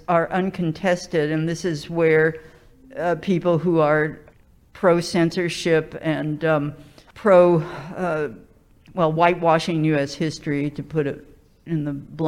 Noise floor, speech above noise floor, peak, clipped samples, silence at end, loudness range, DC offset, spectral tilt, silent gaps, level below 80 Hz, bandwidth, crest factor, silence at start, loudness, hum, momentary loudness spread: -51 dBFS; 30 dB; -2 dBFS; under 0.1%; 0 s; 2 LU; under 0.1%; -6.5 dB/octave; none; -52 dBFS; 12.5 kHz; 18 dB; 0.1 s; -21 LUFS; none; 10 LU